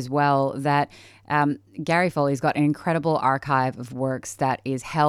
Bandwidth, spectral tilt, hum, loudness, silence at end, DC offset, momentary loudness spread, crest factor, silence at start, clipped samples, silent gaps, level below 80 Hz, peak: 14 kHz; -6.5 dB/octave; none; -23 LUFS; 0 s; under 0.1%; 7 LU; 16 dB; 0 s; under 0.1%; none; -60 dBFS; -8 dBFS